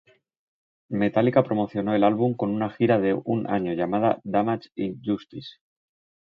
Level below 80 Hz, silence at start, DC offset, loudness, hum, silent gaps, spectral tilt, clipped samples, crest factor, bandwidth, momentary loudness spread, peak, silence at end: -62 dBFS; 0.9 s; under 0.1%; -24 LUFS; none; none; -10 dB/octave; under 0.1%; 20 dB; 5.6 kHz; 10 LU; -6 dBFS; 0.8 s